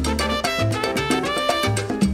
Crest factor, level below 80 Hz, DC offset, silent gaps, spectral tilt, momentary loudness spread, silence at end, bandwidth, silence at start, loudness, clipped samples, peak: 16 dB; -34 dBFS; under 0.1%; none; -4.5 dB/octave; 2 LU; 0 s; 16 kHz; 0 s; -21 LUFS; under 0.1%; -6 dBFS